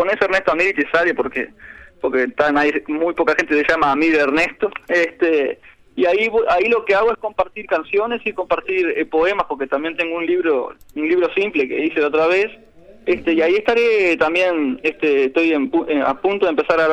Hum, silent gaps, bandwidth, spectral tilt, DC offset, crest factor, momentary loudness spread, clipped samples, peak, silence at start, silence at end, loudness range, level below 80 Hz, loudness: none; none; 9.4 kHz; -5 dB/octave; under 0.1%; 14 dB; 7 LU; under 0.1%; -4 dBFS; 0 s; 0 s; 2 LU; -50 dBFS; -18 LUFS